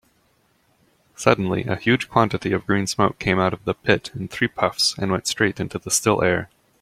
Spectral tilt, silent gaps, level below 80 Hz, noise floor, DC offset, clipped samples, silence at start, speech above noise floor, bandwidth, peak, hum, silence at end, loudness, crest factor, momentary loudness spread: -4 dB/octave; none; -52 dBFS; -63 dBFS; under 0.1%; under 0.1%; 1.2 s; 42 dB; 16 kHz; -2 dBFS; none; 0.35 s; -21 LUFS; 22 dB; 5 LU